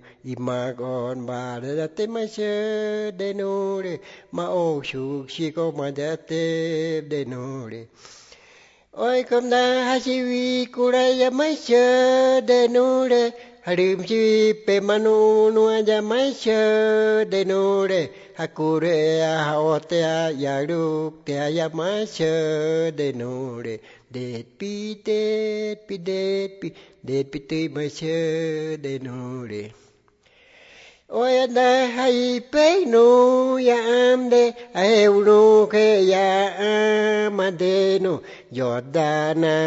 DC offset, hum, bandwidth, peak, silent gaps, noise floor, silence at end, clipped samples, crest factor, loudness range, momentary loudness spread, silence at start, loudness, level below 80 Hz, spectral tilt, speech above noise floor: under 0.1%; none; 8 kHz; -4 dBFS; none; -59 dBFS; 0 s; under 0.1%; 16 dB; 11 LU; 14 LU; 0.25 s; -21 LUFS; -66 dBFS; -5 dB/octave; 38 dB